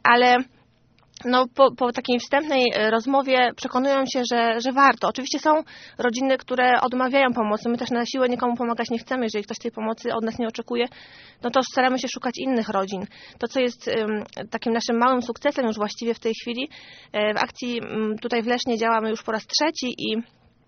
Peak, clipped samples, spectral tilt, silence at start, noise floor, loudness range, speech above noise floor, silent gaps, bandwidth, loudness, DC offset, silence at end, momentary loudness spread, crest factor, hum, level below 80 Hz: -2 dBFS; under 0.1%; -1.5 dB/octave; 0.05 s; -59 dBFS; 5 LU; 37 dB; none; 6.6 kHz; -23 LUFS; under 0.1%; 0.45 s; 10 LU; 22 dB; none; -64 dBFS